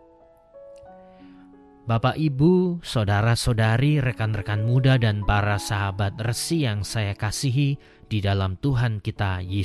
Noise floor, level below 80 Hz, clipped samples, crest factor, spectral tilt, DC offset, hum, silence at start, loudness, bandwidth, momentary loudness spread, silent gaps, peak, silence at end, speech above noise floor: -54 dBFS; -40 dBFS; under 0.1%; 16 dB; -6 dB/octave; under 0.1%; none; 0.55 s; -23 LUFS; 13 kHz; 8 LU; none; -6 dBFS; 0 s; 32 dB